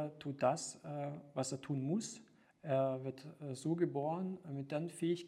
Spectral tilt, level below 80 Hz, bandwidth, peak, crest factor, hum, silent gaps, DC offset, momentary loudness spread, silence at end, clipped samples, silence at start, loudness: -6 dB/octave; -84 dBFS; 13.5 kHz; -20 dBFS; 20 dB; none; none; under 0.1%; 11 LU; 0 s; under 0.1%; 0 s; -40 LUFS